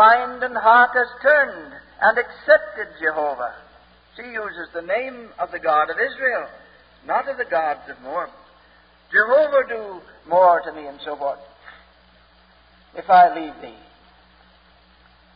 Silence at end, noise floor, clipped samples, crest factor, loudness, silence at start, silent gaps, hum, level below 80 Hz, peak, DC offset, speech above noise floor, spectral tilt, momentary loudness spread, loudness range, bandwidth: 1.65 s; -54 dBFS; under 0.1%; 20 dB; -19 LUFS; 0 s; none; none; -60 dBFS; -2 dBFS; under 0.1%; 34 dB; -8 dB/octave; 21 LU; 6 LU; 5.2 kHz